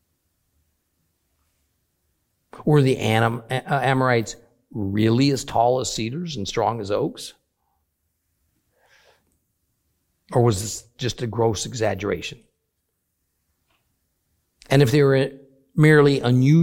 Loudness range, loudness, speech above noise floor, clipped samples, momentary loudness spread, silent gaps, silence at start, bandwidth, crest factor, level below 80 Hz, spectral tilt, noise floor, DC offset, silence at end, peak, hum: 9 LU; -21 LUFS; 55 dB; under 0.1%; 13 LU; none; 2.55 s; 16.5 kHz; 20 dB; -52 dBFS; -6 dB/octave; -75 dBFS; under 0.1%; 0 s; -2 dBFS; none